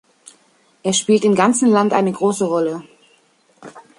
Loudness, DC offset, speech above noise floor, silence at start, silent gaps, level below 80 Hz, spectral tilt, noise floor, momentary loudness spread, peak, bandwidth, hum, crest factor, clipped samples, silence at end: -16 LUFS; under 0.1%; 41 dB; 0.85 s; none; -66 dBFS; -4.5 dB/octave; -57 dBFS; 9 LU; -2 dBFS; 11.5 kHz; none; 16 dB; under 0.1%; 0.2 s